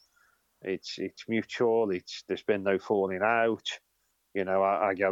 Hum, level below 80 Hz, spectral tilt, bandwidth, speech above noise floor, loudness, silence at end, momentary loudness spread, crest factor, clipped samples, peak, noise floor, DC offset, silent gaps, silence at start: none; -78 dBFS; -5 dB/octave; 7.8 kHz; 46 dB; -29 LUFS; 0 s; 11 LU; 18 dB; under 0.1%; -12 dBFS; -75 dBFS; under 0.1%; none; 0.65 s